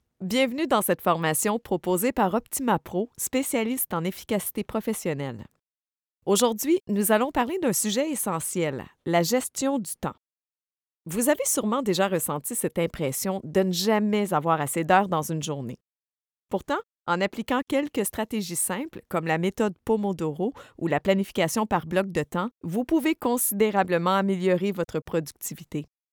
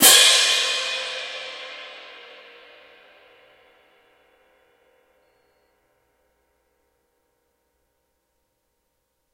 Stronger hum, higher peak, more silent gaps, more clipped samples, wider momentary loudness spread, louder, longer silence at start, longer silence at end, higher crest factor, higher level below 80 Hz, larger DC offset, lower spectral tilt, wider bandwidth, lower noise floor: neither; second, -6 dBFS vs 0 dBFS; neither; neither; second, 8 LU vs 30 LU; second, -26 LUFS vs -17 LUFS; first, 0.2 s vs 0 s; second, 0.3 s vs 7.35 s; second, 20 dB vs 26 dB; first, -58 dBFS vs -72 dBFS; neither; first, -4.5 dB/octave vs 2 dB/octave; first, over 20 kHz vs 16 kHz; first, under -90 dBFS vs -73 dBFS